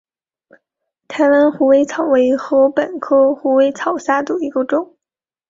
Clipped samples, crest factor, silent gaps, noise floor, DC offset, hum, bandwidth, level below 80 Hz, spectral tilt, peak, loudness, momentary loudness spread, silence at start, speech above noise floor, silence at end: under 0.1%; 14 dB; none; -88 dBFS; under 0.1%; none; 7.6 kHz; -60 dBFS; -5 dB/octave; -2 dBFS; -15 LUFS; 8 LU; 1.1 s; 74 dB; 0.65 s